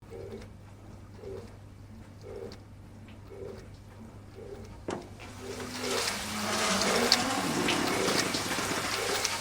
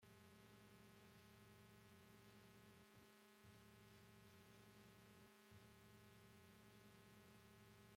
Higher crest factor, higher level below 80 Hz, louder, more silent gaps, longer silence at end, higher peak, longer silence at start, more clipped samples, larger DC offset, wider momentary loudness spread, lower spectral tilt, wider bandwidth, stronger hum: first, 32 dB vs 14 dB; first, -56 dBFS vs -84 dBFS; first, -29 LUFS vs -68 LUFS; neither; about the same, 0 s vs 0 s; first, -2 dBFS vs -54 dBFS; about the same, 0 s vs 0 s; neither; neither; first, 23 LU vs 1 LU; second, -2.5 dB/octave vs -4.5 dB/octave; first, over 20 kHz vs 16.5 kHz; neither